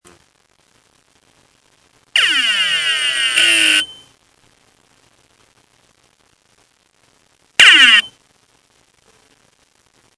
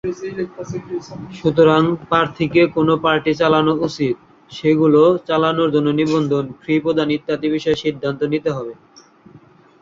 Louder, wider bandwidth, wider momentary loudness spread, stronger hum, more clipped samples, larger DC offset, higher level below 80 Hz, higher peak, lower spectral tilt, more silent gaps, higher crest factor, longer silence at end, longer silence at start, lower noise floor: first, -10 LUFS vs -17 LUFS; first, 11 kHz vs 7.6 kHz; about the same, 12 LU vs 14 LU; neither; neither; neither; second, -64 dBFS vs -52 dBFS; about the same, 0 dBFS vs -2 dBFS; second, 2 dB/octave vs -7 dB/octave; neither; about the same, 18 dB vs 16 dB; first, 2.1 s vs 1.1 s; first, 2.15 s vs 0.05 s; first, -58 dBFS vs -47 dBFS